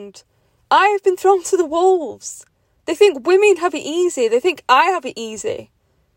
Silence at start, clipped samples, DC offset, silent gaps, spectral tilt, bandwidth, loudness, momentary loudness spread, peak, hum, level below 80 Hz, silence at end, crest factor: 0 s; under 0.1%; under 0.1%; none; -2.5 dB/octave; 16.5 kHz; -16 LUFS; 15 LU; 0 dBFS; none; -64 dBFS; 0.55 s; 16 dB